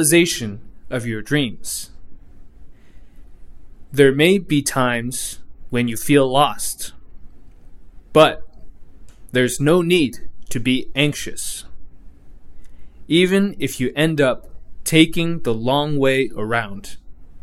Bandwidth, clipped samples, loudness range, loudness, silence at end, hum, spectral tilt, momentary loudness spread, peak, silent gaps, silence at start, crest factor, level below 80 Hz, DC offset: 16 kHz; under 0.1%; 5 LU; -19 LUFS; 0.05 s; none; -4.5 dB/octave; 15 LU; 0 dBFS; none; 0 s; 20 dB; -40 dBFS; under 0.1%